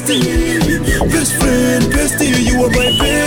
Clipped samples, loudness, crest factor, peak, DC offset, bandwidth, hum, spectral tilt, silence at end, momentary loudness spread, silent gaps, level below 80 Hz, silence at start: under 0.1%; -13 LUFS; 10 dB; -4 dBFS; under 0.1%; 18 kHz; none; -4 dB/octave; 0 s; 2 LU; none; -22 dBFS; 0 s